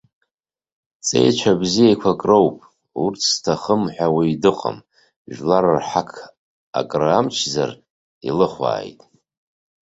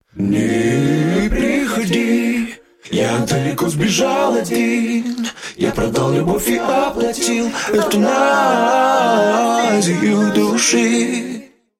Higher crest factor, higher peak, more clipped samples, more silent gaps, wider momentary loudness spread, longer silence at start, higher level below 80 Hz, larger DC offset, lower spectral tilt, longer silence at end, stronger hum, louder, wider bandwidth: about the same, 18 dB vs 14 dB; about the same, -2 dBFS vs -2 dBFS; neither; first, 5.16-5.25 s, 6.37-6.73 s, 7.90-8.21 s vs none; first, 13 LU vs 7 LU; first, 1.05 s vs 0.15 s; second, -56 dBFS vs -38 dBFS; neither; about the same, -4.5 dB/octave vs -4.5 dB/octave; first, 1 s vs 0.35 s; neither; second, -19 LUFS vs -16 LUFS; second, 8.2 kHz vs 16.5 kHz